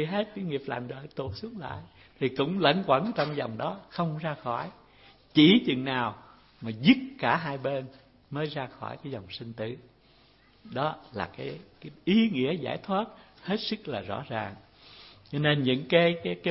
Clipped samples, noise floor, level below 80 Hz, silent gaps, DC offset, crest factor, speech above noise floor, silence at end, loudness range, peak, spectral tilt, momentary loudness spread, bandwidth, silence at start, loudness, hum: under 0.1%; -60 dBFS; -64 dBFS; none; under 0.1%; 24 dB; 32 dB; 0 s; 11 LU; -6 dBFS; -9.5 dB/octave; 16 LU; 5.8 kHz; 0 s; -28 LUFS; none